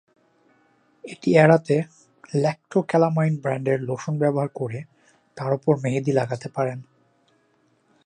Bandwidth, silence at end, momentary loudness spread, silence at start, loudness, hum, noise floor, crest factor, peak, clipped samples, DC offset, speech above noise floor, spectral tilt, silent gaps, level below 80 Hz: 9.8 kHz; 1.2 s; 15 LU; 1.05 s; -22 LUFS; none; -64 dBFS; 22 dB; -2 dBFS; under 0.1%; under 0.1%; 43 dB; -7.5 dB/octave; none; -68 dBFS